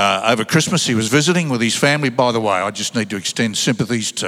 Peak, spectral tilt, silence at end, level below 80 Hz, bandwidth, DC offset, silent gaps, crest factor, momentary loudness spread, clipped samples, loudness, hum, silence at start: 0 dBFS; -4 dB/octave; 0 s; -62 dBFS; 16 kHz; under 0.1%; none; 16 dB; 5 LU; under 0.1%; -17 LUFS; none; 0 s